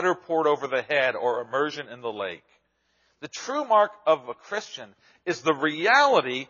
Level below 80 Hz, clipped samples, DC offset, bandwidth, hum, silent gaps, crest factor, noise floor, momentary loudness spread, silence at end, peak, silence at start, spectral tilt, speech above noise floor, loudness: -80 dBFS; under 0.1%; under 0.1%; 7.2 kHz; none; none; 20 dB; -69 dBFS; 17 LU; 0.05 s; -6 dBFS; 0 s; -1.5 dB/octave; 44 dB; -24 LUFS